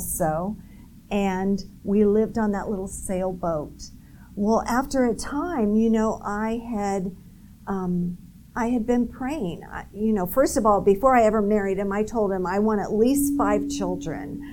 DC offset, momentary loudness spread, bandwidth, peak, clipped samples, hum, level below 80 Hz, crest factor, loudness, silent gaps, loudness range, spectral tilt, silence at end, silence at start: 0.3%; 12 LU; 18.5 kHz; -6 dBFS; under 0.1%; none; -44 dBFS; 18 dB; -24 LUFS; none; 6 LU; -6 dB/octave; 0 s; 0 s